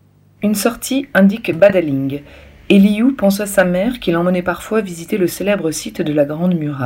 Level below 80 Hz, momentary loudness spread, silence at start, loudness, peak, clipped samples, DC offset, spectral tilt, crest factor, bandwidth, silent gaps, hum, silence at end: -46 dBFS; 9 LU; 0.4 s; -16 LUFS; 0 dBFS; under 0.1%; under 0.1%; -6 dB/octave; 16 dB; 16.5 kHz; none; none; 0 s